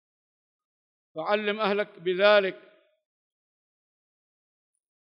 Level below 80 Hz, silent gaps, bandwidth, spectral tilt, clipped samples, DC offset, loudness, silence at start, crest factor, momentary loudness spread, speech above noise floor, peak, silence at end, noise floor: under -90 dBFS; none; 5.8 kHz; -6.5 dB/octave; under 0.1%; under 0.1%; -25 LUFS; 1.15 s; 22 dB; 14 LU; over 65 dB; -8 dBFS; 2.55 s; under -90 dBFS